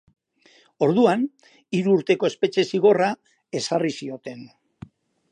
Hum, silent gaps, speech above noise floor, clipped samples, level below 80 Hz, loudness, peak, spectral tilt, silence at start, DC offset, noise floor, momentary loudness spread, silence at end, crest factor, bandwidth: none; none; 36 dB; under 0.1%; -68 dBFS; -22 LUFS; -4 dBFS; -5.5 dB/octave; 0.8 s; under 0.1%; -58 dBFS; 16 LU; 0.85 s; 18 dB; 10 kHz